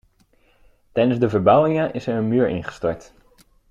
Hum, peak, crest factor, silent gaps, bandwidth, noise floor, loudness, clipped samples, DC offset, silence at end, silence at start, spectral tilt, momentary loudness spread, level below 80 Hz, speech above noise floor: none; -2 dBFS; 20 dB; none; 7.8 kHz; -59 dBFS; -20 LUFS; under 0.1%; under 0.1%; 0.7 s; 0.95 s; -8 dB/octave; 11 LU; -52 dBFS; 40 dB